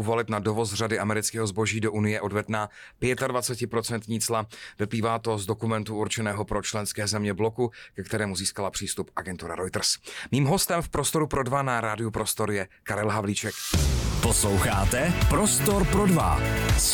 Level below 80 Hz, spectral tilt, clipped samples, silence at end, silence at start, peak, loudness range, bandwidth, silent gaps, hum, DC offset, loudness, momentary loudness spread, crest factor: -36 dBFS; -4 dB/octave; under 0.1%; 0 s; 0 s; -12 dBFS; 5 LU; 19 kHz; none; none; under 0.1%; -26 LUFS; 9 LU; 14 dB